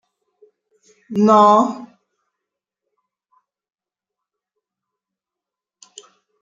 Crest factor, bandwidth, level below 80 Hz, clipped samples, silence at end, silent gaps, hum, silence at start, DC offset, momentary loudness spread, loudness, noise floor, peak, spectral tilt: 20 dB; 7.6 kHz; -72 dBFS; under 0.1%; 4.55 s; none; none; 1.1 s; under 0.1%; 17 LU; -14 LUFS; -87 dBFS; -2 dBFS; -6.5 dB/octave